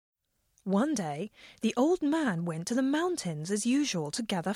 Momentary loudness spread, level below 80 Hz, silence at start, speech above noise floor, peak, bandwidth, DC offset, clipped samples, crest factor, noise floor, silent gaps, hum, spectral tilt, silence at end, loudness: 8 LU; -70 dBFS; 0.65 s; 43 dB; -16 dBFS; 15 kHz; under 0.1%; under 0.1%; 14 dB; -72 dBFS; none; none; -5 dB/octave; 0 s; -30 LUFS